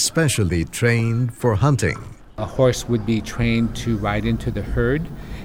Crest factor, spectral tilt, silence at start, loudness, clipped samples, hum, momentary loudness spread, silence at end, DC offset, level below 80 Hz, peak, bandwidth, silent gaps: 16 dB; -5.5 dB/octave; 0 s; -21 LUFS; under 0.1%; none; 7 LU; 0 s; 0.2%; -34 dBFS; -4 dBFS; 16.5 kHz; none